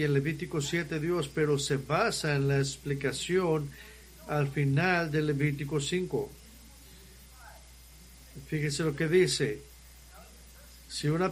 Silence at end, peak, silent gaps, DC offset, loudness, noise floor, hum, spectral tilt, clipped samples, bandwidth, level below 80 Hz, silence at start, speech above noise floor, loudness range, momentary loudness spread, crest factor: 0 s; -12 dBFS; none; under 0.1%; -30 LUFS; -52 dBFS; none; -5 dB/octave; under 0.1%; 15.5 kHz; -54 dBFS; 0 s; 23 dB; 6 LU; 18 LU; 18 dB